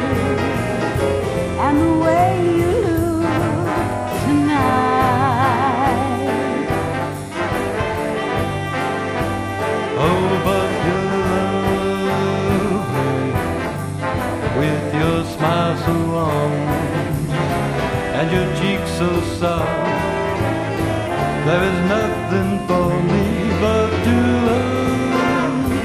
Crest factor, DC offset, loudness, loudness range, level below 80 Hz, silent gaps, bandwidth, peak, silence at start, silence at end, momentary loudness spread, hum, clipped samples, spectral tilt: 14 dB; under 0.1%; -18 LUFS; 3 LU; -36 dBFS; none; 15.5 kHz; -4 dBFS; 0 s; 0 s; 5 LU; none; under 0.1%; -6.5 dB/octave